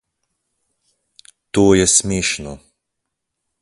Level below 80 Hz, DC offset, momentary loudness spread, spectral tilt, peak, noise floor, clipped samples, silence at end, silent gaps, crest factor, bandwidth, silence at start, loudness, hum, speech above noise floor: -42 dBFS; under 0.1%; 14 LU; -3.5 dB/octave; 0 dBFS; -78 dBFS; under 0.1%; 1.05 s; none; 20 dB; 11.5 kHz; 1.55 s; -15 LUFS; none; 62 dB